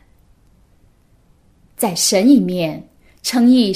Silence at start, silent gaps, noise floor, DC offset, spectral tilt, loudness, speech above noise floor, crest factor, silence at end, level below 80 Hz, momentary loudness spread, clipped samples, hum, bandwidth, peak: 1.8 s; none; -53 dBFS; under 0.1%; -4 dB/octave; -15 LUFS; 40 dB; 16 dB; 0 s; -54 dBFS; 12 LU; under 0.1%; none; 15.5 kHz; -2 dBFS